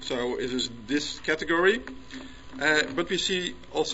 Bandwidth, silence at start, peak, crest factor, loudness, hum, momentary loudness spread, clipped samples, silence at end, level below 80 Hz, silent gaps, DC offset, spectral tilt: 8.2 kHz; 0 s; -6 dBFS; 22 dB; -27 LUFS; none; 19 LU; under 0.1%; 0 s; -52 dBFS; none; 0.4%; -3 dB/octave